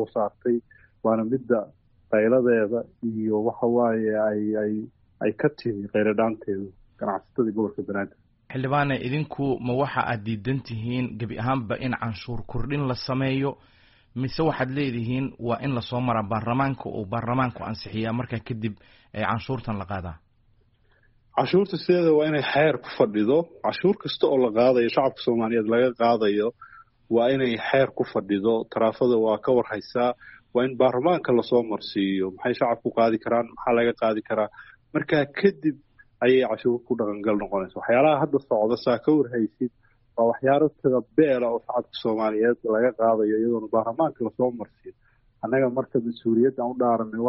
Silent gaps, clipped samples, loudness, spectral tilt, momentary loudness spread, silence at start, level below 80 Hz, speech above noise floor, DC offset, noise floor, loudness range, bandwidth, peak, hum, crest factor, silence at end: none; under 0.1%; -24 LUFS; -5.5 dB/octave; 10 LU; 0 s; -52 dBFS; 38 dB; under 0.1%; -62 dBFS; 6 LU; 5.8 kHz; -6 dBFS; none; 18 dB; 0 s